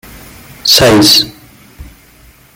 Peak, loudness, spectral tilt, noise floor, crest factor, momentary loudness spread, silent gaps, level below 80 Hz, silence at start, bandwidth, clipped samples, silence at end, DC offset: 0 dBFS; -7 LUFS; -3 dB/octave; -42 dBFS; 12 dB; 11 LU; none; -36 dBFS; 0.65 s; over 20 kHz; 0.1%; 0.7 s; under 0.1%